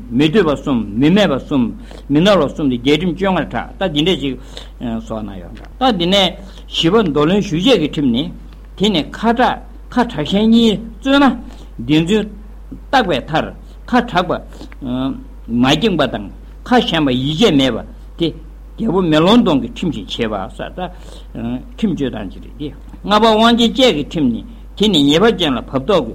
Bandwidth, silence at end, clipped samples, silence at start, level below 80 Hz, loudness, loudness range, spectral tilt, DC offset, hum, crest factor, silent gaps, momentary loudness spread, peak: 15.5 kHz; 0 s; under 0.1%; 0 s; -34 dBFS; -15 LUFS; 4 LU; -5.5 dB/octave; under 0.1%; none; 16 dB; none; 17 LU; 0 dBFS